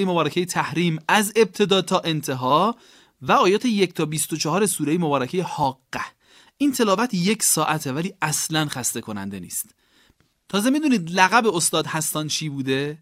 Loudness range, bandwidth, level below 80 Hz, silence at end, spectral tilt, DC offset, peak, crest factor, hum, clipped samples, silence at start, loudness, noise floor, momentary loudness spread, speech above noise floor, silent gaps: 3 LU; 16 kHz; -64 dBFS; 0.05 s; -3.5 dB/octave; under 0.1%; -2 dBFS; 20 dB; none; under 0.1%; 0 s; -21 LUFS; -61 dBFS; 11 LU; 39 dB; none